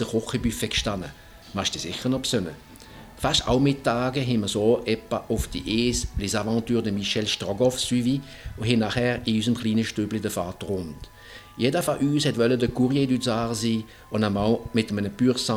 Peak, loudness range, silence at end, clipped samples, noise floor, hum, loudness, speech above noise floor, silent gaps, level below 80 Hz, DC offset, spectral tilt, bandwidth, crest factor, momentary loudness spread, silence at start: -6 dBFS; 2 LU; 0 s; under 0.1%; -45 dBFS; none; -25 LUFS; 20 dB; none; -44 dBFS; under 0.1%; -5 dB/octave; 16.5 kHz; 18 dB; 9 LU; 0 s